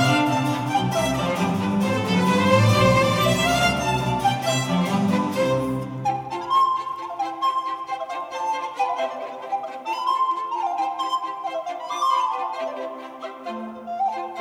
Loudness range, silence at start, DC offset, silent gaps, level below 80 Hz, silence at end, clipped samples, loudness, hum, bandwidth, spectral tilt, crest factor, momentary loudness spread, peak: 7 LU; 0 s; under 0.1%; none; -48 dBFS; 0 s; under 0.1%; -23 LUFS; none; 19 kHz; -5 dB/octave; 18 dB; 12 LU; -4 dBFS